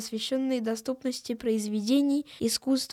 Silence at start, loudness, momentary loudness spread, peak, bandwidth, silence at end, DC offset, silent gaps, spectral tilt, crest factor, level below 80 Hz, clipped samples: 0 s; -29 LUFS; 7 LU; -14 dBFS; 16 kHz; 0 s; under 0.1%; none; -4 dB/octave; 14 dB; -68 dBFS; under 0.1%